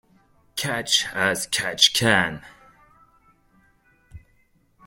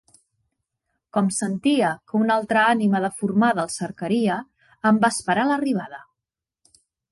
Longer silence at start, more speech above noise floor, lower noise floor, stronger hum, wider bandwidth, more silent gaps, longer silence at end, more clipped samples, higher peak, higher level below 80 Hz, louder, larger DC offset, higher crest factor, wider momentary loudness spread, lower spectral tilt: second, 0.55 s vs 1.15 s; second, 40 dB vs 66 dB; second, -62 dBFS vs -87 dBFS; neither; first, 16.5 kHz vs 11.5 kHz; neither; second, 0.7 s vs 1.1 s; neither; first, -2 dBFS vs -8 dBFS; first, -56 dBFS vs -66 dBFS; about the same, -20 LUFS vs -22 LUFS; neither; first, 24 dB vs 16 dB; first, 12 LU vs 9 LU; second, -2 dB/octave vs -5 dB/octave